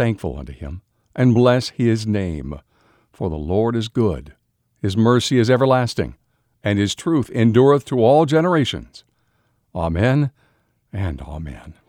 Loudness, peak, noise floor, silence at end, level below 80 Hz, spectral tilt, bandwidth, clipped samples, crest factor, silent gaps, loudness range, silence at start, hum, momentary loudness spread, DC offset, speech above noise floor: -18 LUFS; -2 dBFS; -65 dBFS; 0.15 s; -40 dBFS; -6.5 dB/octave; 13 kHz; under 0.1%; 16 dB; none; 6 LU; 0 s; none; 18 LU; under 0.1%; 47 dB